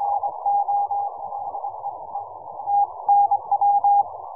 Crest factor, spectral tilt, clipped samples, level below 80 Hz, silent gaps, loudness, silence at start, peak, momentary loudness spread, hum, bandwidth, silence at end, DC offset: 12 dB; -12 dB/octave; under 0.1%; -70 dBFS; none; -22 LUFS; 0 s; -10 dBFS; 15 LU; none; 1.3 kHz; 0 s; 0.2%